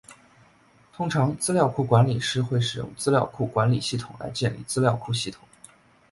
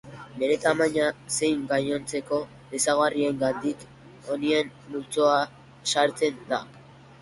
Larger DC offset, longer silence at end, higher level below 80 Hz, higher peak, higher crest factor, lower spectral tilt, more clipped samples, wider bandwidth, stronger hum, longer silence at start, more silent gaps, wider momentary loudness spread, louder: neither; first, 0.8 s vs 0.4 s; first, -56 dBFS vs -62 dBFS; first, -4 dBFS vs -8 dBFS; about the same, 20 dB vs 18 dB; first, -5.5 dB/octave vs -3.5 dB/octave; neither; about the same, 11.5 kHz vs 11.5 kHz; neither; about the same, 0.1 s vs 0.05 s; neither; about the same, 9 LU vs 11 LU; about the same, -25 LUFS vs -26 LUFS